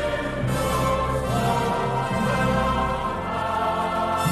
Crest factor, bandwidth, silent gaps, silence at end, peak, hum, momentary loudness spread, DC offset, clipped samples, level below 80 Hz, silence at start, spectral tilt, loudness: 14 dB; 15 kHz; none; 0 s; -10 dBFS; none; 4 LU; under 0.1%; under 0.1%; -36 dBFS; 0 s; -5.5 dB/octave; -24 LUFS